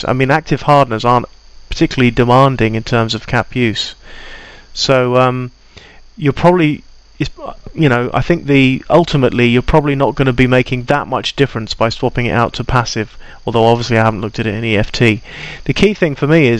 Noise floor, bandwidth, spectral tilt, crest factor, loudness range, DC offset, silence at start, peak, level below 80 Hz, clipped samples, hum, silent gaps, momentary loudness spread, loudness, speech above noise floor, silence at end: -39 dBFS; 11.5 kHz; -6.5 dB/octave; 14 dB; 3 LU; under 0.1%; 0 s; 0 dBFS; -32 dBFS; under 0.1%; none; none; 12 LU; -13 LUFS; 26 dB; 0 s